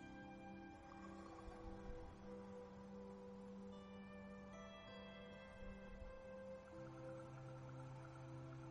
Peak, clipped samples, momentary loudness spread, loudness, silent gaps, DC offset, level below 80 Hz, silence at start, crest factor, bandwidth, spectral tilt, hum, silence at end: -40 dBFS; under 0.1%; 2 LU; -57 LUFS; none; under 0.1%; -64 dBFS; 0 s; 16 dB; 11 kHz; -7 dB/octave; none; 0 s